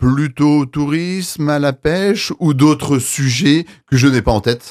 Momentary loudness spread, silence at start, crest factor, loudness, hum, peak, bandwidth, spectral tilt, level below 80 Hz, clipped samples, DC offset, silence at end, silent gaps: 5 LU; 0 s; 14 dB; -15 LUFS; none; 0 dBFS; 15.5 kHz; -5.5 dB/octave; -36 dBFS; under 0.1%; under 0.1%; 0 s; none